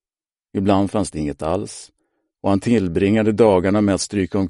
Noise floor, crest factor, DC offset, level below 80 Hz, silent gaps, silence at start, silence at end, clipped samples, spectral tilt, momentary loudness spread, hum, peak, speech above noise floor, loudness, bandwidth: under -90 dBFS; 16 dB; under 0.1%; -46 dBFS; none; 0.55 s; 0 s; under 0.1%; -6 dB/octave; 11 LU; none; -2 dBFS; over 72 dB; -19 LUFS; 11.5 kHz